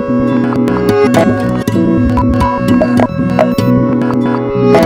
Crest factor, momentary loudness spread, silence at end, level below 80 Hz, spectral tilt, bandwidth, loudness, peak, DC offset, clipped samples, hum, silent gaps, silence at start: 10 dB; 3 LU; 0 s; -28 dBFS; -7.5 dB/octave; 16 kHz; -11 LUFS; 0 dBFS; under 0.1%; 0.2%; none; none; 0 s